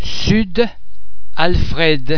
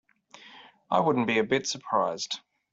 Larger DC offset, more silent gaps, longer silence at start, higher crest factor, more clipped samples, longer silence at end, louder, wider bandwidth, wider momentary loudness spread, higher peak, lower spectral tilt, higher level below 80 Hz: neither; neither; second, 0 s vs 0.45 s; second, 14 dB vs 20 dB; neither; second, 0 s vs 0.35 s; first, -17 LUFS vs -27 LUFS; second, 5.4 kHz vs 8.2 kHz; second, 5 LU vs 10 LU; first, 0 dBFS vs -10 dBFS; first, -5.5 dB/octave vs -4 dB/octave; first, -26 dBFS vs -70 dBFS